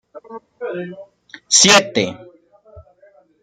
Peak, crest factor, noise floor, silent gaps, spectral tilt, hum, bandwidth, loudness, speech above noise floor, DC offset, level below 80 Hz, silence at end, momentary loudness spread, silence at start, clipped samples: 0 dBFS; 20 dB; -52 dBFS; none; -1.5 dB/octave; none; 16 kHz; -13 LUFS; 36 dB; under 0.1%; -58 dBFS; 0.6 s; 26 LU; 0.15 s; under 0.1%